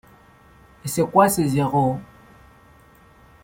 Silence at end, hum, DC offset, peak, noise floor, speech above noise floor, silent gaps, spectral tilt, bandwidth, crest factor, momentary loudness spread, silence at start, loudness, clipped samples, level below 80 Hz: 1.4 s; none; under 0.1%; -4 dBFS; -51 dBFS; 32 dB; none; -6 dB/octave; 16.5 kHz; 20 dB; 14 LU; 0.85 s; -20 LUFS; under 0.1%; -52 dBFS